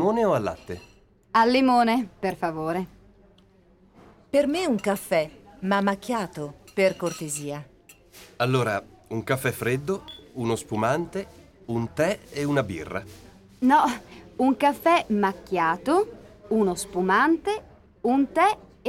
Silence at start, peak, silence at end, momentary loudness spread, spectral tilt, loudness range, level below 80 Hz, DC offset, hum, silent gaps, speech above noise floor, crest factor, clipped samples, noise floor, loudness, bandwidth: 0 s; -8 dBFS; 0 s; 14 LU; -5.5 dB/octave; 5 LU; -56 dBFS; under 0.1%; none; none; 33 dB; 18 dB; under 0.1%; -57 dBFS; -25 LUFS; 17 kHz